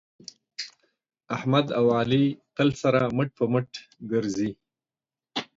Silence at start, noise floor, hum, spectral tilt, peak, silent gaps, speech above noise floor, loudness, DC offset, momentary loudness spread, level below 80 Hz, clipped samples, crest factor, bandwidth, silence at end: 0.6 s; under -90 dBFS; none; -6.5 dB/octave; -8 dBFS; none; over 66 dB; -25 LUFS; under 0.1%; 17 LU; -62 dBFS; under 0.1%; 20 dB; 7.8 kHz; 0.15 s